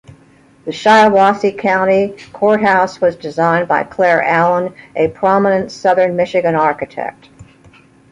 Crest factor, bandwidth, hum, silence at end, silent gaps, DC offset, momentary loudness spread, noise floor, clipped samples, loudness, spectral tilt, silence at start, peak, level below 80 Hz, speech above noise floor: 14 dB; 11 kHz; none; 0.7 s; none; under 0.1%; 11 LU; -47 dBFS; under 0.1%; -13 LUFS; -6 dB/octave; 0.65 s; 0 dBFS; -54 dBFS; 34 dB